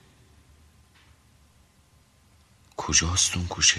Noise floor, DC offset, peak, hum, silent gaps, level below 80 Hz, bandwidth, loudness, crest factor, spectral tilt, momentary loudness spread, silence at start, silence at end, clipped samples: -60 dBFS; under 0.1%; -2 dBFS; none; none; -46 dBFS; 13 kHz; -22 LUFS; 26 dB; -1 dB/octave; 17 LU; 2.8 s; 0 s; under 0.1%